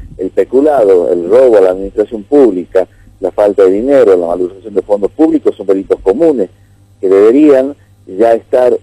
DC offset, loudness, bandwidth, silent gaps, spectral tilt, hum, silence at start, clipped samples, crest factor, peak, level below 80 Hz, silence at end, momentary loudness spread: under 0.1%; -10 LUFS; 11.5 kHz; none; -7.5 dB/octave; none; 0 s; 1%; 10 dB; 0 dBFS; -42 dBFS; 0.05 s; 10 LU